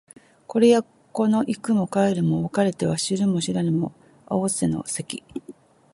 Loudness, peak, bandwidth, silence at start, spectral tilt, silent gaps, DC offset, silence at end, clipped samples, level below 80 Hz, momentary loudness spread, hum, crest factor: -23 LUFS; -6 dBFS; 11.5 kHz; 0.5 s; -5.5 dB/octave; none; under 0.1%; 0.4 s; under 0.1%; -58 dBFS; 13 LU; none; 18 dB